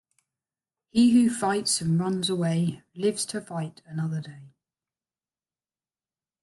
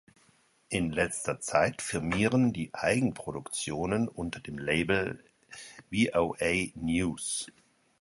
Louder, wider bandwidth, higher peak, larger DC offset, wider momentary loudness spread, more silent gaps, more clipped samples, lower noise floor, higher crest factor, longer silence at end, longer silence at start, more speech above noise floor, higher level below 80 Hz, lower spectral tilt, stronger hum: first, -26 LUFS vs -30 LUFS; about the same, 12.5 kHz vs 11.5 kHz; about the same, -10 dBFS vs -8 dBFS; neither; first, 15 LU vs 11 LU; neither; neither; first, under -90 dBFS vs -66 dBFS; second, 16 dB vs 22 dB; first, 1.95 s vs 0.5 s; first, 0.95 s vs 0.7 s; first, over 65 dB vs 36 dB; second, -66 dBFS vs -54 dBFS; about the same, -5 dB/octave vs -4.5 dB/octave; neither